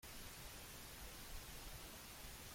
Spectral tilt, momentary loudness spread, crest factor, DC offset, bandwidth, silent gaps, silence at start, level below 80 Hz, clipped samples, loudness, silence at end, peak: -2.5 dB/octave; 1 LU; 14 dB; under 0.1%; 16.5 kHz; none; 0 s; -60 dBFS; under 0.1%; -54 LUFS; 0 s; -40 dBFS